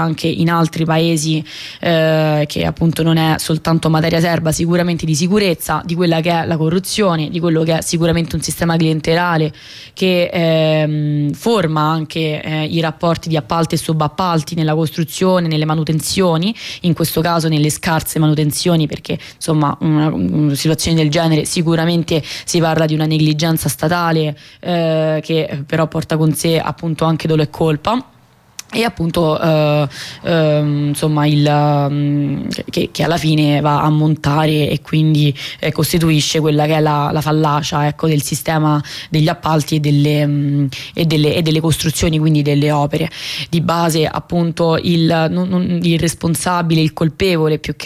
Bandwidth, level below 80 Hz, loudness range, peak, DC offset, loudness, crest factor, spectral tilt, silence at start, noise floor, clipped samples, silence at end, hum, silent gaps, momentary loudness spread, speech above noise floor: 15 kHz; -42 dBFS; 2 LU; -4 dBFS; under 0.1%; -15 LUFS; 12 dB; -5.5 dB/octave; 0 s; -37 dBFS; under 0.1%; 0 s; none; none; 5 LU; 23 dB